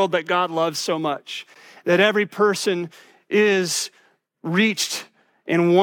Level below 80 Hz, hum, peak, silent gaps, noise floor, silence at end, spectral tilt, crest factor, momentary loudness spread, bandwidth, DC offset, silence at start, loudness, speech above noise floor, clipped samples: -80 dBFS; none; -4 dBFS; none; -60 dBFS; 0 s; -4 dB/octave; 18 dB; 14 LU; 17.5 kHz; under 0.1%; 0 s; -21 LUFS; 39 dB; under 0.1%